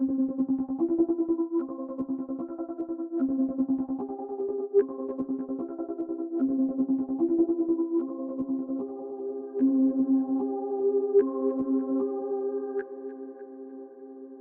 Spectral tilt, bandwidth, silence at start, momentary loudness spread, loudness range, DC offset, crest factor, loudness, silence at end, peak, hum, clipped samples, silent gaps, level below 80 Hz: -10.5 dB/octave; 2 kHz; 0 s; 11 LU; 4 LU; under 0.1%; 16 dB; -29 LUFS; 0 s; -12 dBFS; none; under 0.1%; none; -70 dBFS